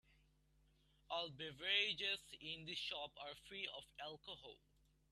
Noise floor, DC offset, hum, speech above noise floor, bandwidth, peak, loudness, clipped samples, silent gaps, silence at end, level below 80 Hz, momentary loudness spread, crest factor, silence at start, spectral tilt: -76 dBFS; under 0.1%; none; 29 dB; 13.5 kHz; -24 dBFS; -44 LUFS; under 0.1%; none; 0.55 s; -76 dBFS; 16 LU; 26 dB; 1.1 s; -2.5 dB/octave